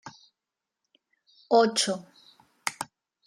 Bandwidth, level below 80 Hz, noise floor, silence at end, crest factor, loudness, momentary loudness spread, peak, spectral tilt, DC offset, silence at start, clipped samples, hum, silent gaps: 15.5 kHz; -82 dBFS; -88 dBFS; 0.4 s; 24 dB; -26 LUFS; 18 LU; -8 dBFS; -2.5 dB/octave; under 0.1%; 0.05 s; under 0.1%; none; none